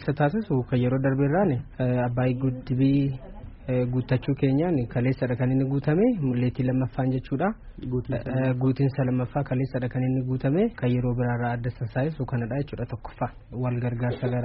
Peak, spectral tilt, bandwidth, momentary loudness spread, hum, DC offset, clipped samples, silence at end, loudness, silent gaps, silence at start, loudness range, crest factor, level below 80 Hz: -10 dBFS; -8.5 dB/octave; 5.2 kHz; 8 LU; none; under 0.1%; under 0.1%; 0 s; -26 LUFS; none; 0 s; 3 LU; 14 dB; -46 dBFS